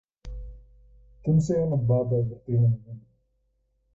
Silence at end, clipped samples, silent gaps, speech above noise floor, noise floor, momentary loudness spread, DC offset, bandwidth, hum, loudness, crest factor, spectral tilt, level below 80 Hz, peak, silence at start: 0.95 s; under 0.1%; none; 48 dB; -71 dBFS; 21 LU; under 0.1%; 7.6 kHz; none; -25 LUFS; 14 dB; -10 dB/octave; -46 dBFS; -12 dBFS; 0.25 s